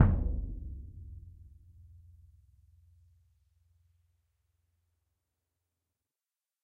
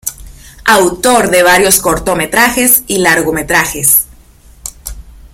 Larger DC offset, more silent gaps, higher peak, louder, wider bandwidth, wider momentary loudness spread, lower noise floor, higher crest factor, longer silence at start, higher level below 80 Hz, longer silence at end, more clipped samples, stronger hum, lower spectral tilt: neither; neither; second, -8 dBFS vs 0 dBFS; second, -37 LUFS vs -9 LUFS; second, 3 kHz vs over 20 kHz; first, 24 LU vs 18 LU; first, under -90 dBFS vs -40 dBFS; first, 30 dB vs 12 dB; about the same, 0 s vs 0.05 s; second, -42 dBFS vs -34 dBFS; first, 5.2 s vs 0.25 s; second, under 0.1% vs 0.3%; neither; first, -11.5 dB/octave vs -2.5 dB/octave